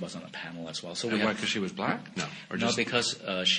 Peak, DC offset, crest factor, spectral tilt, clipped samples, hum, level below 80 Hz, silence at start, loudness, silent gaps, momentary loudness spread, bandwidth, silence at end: -10 dBFS; under 0.1%; 20 dB; -3 dB/octave; under 0.1%; none; -68 dBFS; 0 s; -30 LUFS; none; 12 LU; 10.5 kHz; 0 s